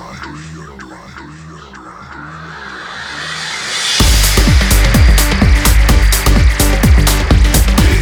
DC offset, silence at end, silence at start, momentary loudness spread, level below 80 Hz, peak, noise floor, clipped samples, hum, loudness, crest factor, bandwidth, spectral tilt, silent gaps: under 0.1%; 0 s; 0 s; 22 LU; -12 dBFS; 0 dBFS; -32 dBFS; under 0.1%; none; -11 LUFS; 12 dB; 19.5 kHz; -4 dB/octave; none